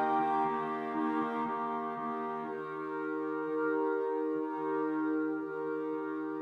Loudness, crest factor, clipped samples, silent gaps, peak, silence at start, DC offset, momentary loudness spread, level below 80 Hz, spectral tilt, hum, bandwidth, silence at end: -34 LUFS; 14 dB; under 0.1%; none; -20 dBFS; 0 s; under 0.1%; 6 LU; -86 dBFS; -8 dB/octave; none; 5.2 kHz; 0 s